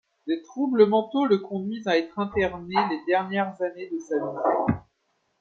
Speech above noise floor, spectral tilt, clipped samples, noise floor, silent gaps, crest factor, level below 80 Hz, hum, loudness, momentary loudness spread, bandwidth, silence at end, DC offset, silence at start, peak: 48 dB; -7 dB/octave; under 0.1%; -73 dBFS; none; 20 dB; -58 dBFS; none; -25 LUFS; 11 LU; 6.8 kHz; 0.6 s; under 0.1%; 0.25 s; -6 dBFS